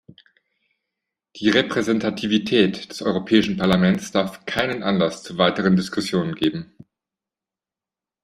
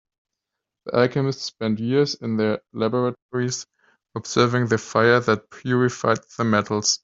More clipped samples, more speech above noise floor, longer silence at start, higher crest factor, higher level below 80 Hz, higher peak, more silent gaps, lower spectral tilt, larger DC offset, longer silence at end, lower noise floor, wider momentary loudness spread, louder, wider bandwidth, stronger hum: neither; first, 69 dB vs 62 dB; first, 1.35 s vs 0.85 s; about the same, 20 dB vs 20 dB; about the same, -56 dBFS vs -60 dBFS; about the same, -2 dBFS vs -4 dBFS; second, none vs 3.22-3.29 s; about the same, -5.5 dB/octave vs -4.5 dB/octave; neither; first, 1.6 s vs 0.05 s; first, -90 dBFS vs -84 dBFS; about the same, 6 LU vs 8 LU; about the same, -21 LUFS vs -22 LUFS; first, 13 kHz vs 7.8 kHz; neither